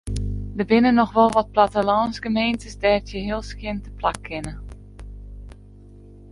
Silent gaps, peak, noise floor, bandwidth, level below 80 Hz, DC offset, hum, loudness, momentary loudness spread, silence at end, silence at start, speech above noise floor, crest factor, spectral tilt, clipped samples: none; -2 dBFS; -44 dBFS; 11.5 kHz; -38 dBFS; under 0.1%; 50 Hz at -40 dBFS; -21 LUFS; 24 LU; 0 s; 0.05 s; 24 dB; 20 dB; -6 dB/octave; under 0.1%